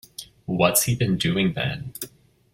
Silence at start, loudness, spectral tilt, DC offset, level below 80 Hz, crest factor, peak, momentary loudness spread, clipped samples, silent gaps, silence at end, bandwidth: 0.2 s; -22 LUFS; -4 dB/octave; under 0.1%; -50 dBFS; 22 dB; -2 dBFS; 18 LU; under 0.1%; none; 0.45 s; 16.5 kHz